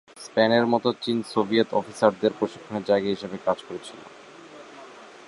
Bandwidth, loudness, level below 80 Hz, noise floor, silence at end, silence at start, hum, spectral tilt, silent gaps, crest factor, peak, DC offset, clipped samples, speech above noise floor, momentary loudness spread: 11.5 kHz; -24 LUFS; -66 dBFS; -45 dBFS; 0.2 s; 0.15 s; none; -5.5 dB/octave; none; 22 dB; -4 dBFS; under 0.1%; under 0.1%; 21 dB; 23 LU